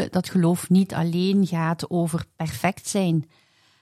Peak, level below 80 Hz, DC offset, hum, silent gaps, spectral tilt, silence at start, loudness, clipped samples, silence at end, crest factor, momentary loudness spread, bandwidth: -8 dBFS; -58 dBFS; under 0.1%; none; none; -6 dB/octave; 0 s; -23 LUFS; under 0.1%; 0.6 s; 14 dB; 7 LU; 14.5 kHz